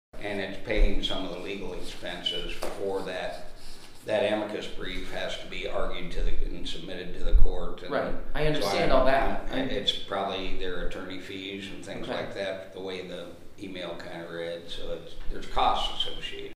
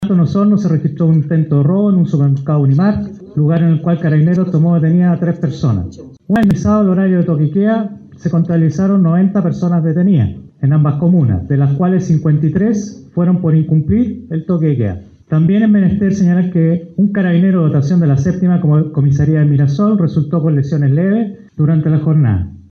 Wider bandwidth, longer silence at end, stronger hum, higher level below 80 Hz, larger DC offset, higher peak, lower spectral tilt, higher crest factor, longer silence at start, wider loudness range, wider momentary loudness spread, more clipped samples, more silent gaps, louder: first, 10.5 kHz vs 6.6 kHz; about the same, 0 s vs 0.1 s; neither; first, -32 dBFS vs -42 dBFS; neither; about the same, -4 dBFS vs -2 dBFS; second, -4.5 dB/octave vs -9.5 dB/octave; first, 22 dB vs 10 dB; first, 0.15 s vs 0 s; first, 8 LU vs 2 LU; first, 12 LU vs 6 LU; neither; neither; second, -31 LUFS vs -13 LUFS